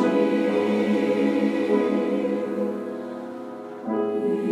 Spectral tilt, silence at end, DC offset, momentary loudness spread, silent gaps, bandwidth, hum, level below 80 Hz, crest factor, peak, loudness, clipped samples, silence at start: -7 dB/octave; 0 s; under 0.1%; 13 LU; none; 11.5 kHz; none; -78 dBFS; 14 dB; -10 dBFS; -24 LUFS; under 0.1%; 0 s